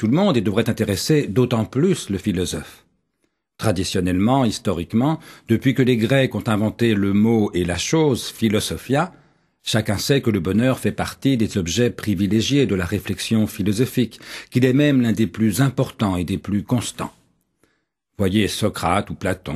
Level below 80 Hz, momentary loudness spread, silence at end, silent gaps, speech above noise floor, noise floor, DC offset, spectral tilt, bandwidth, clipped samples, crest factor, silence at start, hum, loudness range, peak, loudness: -48 dBFS; 7 LU; 0 s; none; 52 dB; -71 dBFS; under 0.1%; -5.5 dB/octave; 13.5 kHz; under 0.1%; 18 dB; 0 s; none; 4 LU; -2 dBFS; -20 LUFS